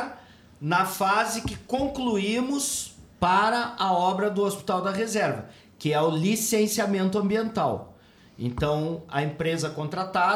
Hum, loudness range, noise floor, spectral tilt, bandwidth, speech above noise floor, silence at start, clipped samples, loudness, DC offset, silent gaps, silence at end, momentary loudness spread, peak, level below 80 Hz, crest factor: none; 2 LU; -48 dBFS; -4.5 dB/octave; 19 kHz; 22 dB; 0 s; under 0.1%; -26 LUFS; under 0.1%; none; 0 s; 8 LU; -10 dBFS; -52 dBFS; 16 dB